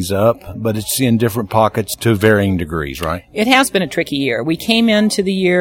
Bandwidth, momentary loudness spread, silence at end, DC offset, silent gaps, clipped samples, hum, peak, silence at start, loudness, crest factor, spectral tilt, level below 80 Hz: 17.5 kHz; 9 LU; 0 s; under 0.1%; none; under 0.1%; none; 0 dBFS; 0 s; -15 LUFS; 16 dB; -5 dB/octave; -42 dBFS